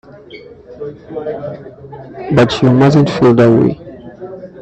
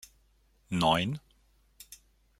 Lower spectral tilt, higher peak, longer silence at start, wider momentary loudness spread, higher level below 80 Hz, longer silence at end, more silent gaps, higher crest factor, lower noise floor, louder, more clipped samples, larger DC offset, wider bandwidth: first, -8 dB/octave vs -5 dB/octave; first, 0 dBFS vs -12 dBFS; second, 0.3 s vs 0.7 s; about the same, 22 LU vs 24 LU; first, -44 dBFS vs -60 dBFS; second, 0 s vs 0.45 s; neither; second, 14 dB vs 22 dB; second, -35 dBFS vs -67 dBFS; first, -11 LUFS vs -29 LUFS; neither; neither; second, 8.4 kHz vs 16 kHz